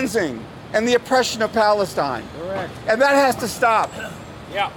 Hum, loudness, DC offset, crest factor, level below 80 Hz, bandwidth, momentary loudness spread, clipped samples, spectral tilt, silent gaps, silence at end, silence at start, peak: none; -20 LUFS; under 0.1%; 14 dB; -50 dBFS; 19 kHz; 13 LU; under 0.1%; -3.5 dB/octave; none; 0 s; 0 s; -6 dBFS